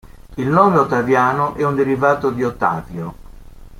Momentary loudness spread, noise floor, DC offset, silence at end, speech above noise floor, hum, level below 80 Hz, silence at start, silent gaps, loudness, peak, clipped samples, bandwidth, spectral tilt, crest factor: 16 LU; -37 dBFS; under 0.1%; 0 s; 21 dB; none; -42 dBFS; 0.05 s; none; -16 LUFS; -2 dBFS; under 0.1%; 16 kHz; -7.5 dB/octave; 16 dB